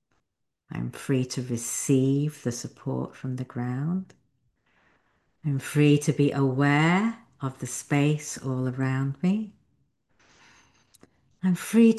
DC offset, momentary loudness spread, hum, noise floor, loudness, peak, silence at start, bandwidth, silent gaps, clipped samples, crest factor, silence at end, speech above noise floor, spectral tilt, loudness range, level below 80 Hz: under 0.1%; 13 LU; none; -79 dBFS; -26 LUFS; -8 dBFS; 0.7 s; 12.5 kHz; none; under 0.1%; 18 dB; 0 s; 55 dB; -6 dB/octave; 7 LU; -66 dBFS